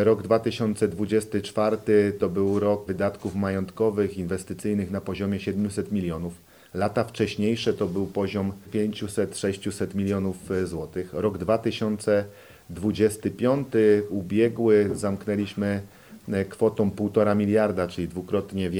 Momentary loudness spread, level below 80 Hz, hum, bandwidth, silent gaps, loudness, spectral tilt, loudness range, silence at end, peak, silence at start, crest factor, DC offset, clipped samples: 9 LU; -56 dBFS; none; 16.5 kHz; none; -25 LUFS; -6.5 dB/octave; 4 LU; 0 s; -6 dBFS; 0 s; 18 dB; under 0.1%; under 0.1%